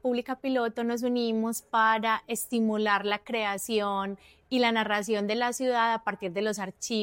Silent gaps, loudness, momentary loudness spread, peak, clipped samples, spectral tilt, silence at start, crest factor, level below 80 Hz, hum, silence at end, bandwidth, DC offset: none; -28 LUFS; 7 LU; -12 dBFS; under 0.1%; -3.5 dB/octave; 0.05 s; 16 dB; -68 dBFS; none; 0 s; 17 kHz; under 0.1%